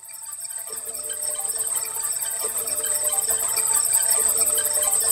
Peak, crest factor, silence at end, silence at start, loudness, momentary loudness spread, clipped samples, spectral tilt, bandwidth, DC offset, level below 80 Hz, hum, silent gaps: -6 dBFS; 18 dB; 0 s; 0 s; -20 LUFS; 12 LU; under 0.1%; 1.5 dB/octave; 16.5 kHz; under 0.1%; -60 dBFS; none; none